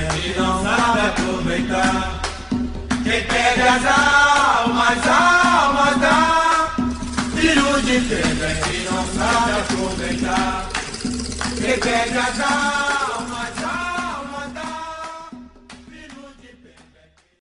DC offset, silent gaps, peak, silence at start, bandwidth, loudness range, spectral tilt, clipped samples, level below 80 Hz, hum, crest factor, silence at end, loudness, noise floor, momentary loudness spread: under 0.1%; none; -2 dBFS; 0 s; 11 kHz; 12 LU; -3.5 dB/octave; under 0.1%; -34 dBFS; none; 18 dB; 0.95 s; -18 LUFS; -55 dBFS; 12 LU